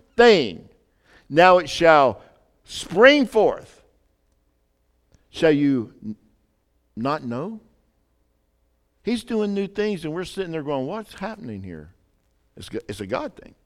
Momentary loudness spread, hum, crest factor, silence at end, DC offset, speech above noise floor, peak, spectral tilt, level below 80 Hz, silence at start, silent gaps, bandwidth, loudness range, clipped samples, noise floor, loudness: 23 LU; none; 22 dB; 0.35 s; under 0.1%; 47 dB; 0 dBFS; -5 dB/octave; -54 dBFS; 0.2 s; none; 13.5 kHz; 13 LU; under 0.1%; -67 dBFS; -20 LUFS